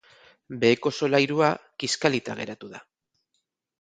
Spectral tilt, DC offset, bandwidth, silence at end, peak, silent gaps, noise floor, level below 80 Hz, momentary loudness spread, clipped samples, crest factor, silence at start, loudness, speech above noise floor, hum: -4.5 dB/octave; under 0.1%; 9.4 kHz; 1 s; -4 dBFS; none; -78 dBFS; -68 dBFS; 17 LU; under 0.1%; 24 dB; 0.5 s; -24 LUFS; 53 dB; none